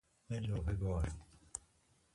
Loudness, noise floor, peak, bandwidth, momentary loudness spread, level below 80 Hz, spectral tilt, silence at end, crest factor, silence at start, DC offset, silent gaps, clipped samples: -41 LUFS; -73 dBFS; -22 dBFS; 11.5 kHz; 11 LU; -46 dBFS; -6.5 dB/octave; 0.55 s; 20 dB; 0.3 s; under 0.1%; none; under 0.1%